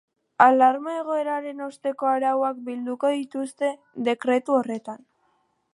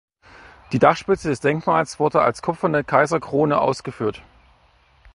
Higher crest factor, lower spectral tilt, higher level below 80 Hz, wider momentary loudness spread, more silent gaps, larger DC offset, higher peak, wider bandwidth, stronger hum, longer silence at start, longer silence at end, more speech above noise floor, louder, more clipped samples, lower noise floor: about the same, 22 dB vs 20 dB; second, -4.5 dB/octave vs -6 dB/octave; second, -82 dBFS vs -52 dBFS; first, 14 LU vs 8 LU; neither; neither; about the same, -2 dBFS vs 0 dBFS; about the same, 11.5 kHz vs 11.5 kHz; neither; second, 0.4 s vs 0.7 s; second, 0.75 s vs 0.95 s; first, 45 dB vs 37 dB; second, -24 LUFS vs -20 LUFS; neither; first, -68 dBFS vs -57 dBFS